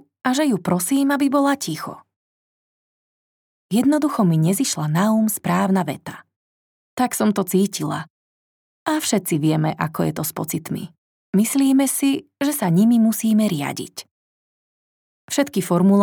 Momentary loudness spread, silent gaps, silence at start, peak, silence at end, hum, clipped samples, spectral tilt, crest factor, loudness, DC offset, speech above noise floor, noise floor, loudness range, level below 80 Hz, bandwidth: 13 LU; 2.16-3.69 s, 6.36-6.97 s, 8.10-8.86 s, 10.98-11.33 s, 14.11-15.28 s; 0.25 s; -4 dBFS; 0 s; none; under 0.1%; -5.5 dB/octave; 16 dB; -20 LUFS; under 0.1%; over 71 dB; under -90 dBFS; 4 LU; -68 dBFS; over 20 kHz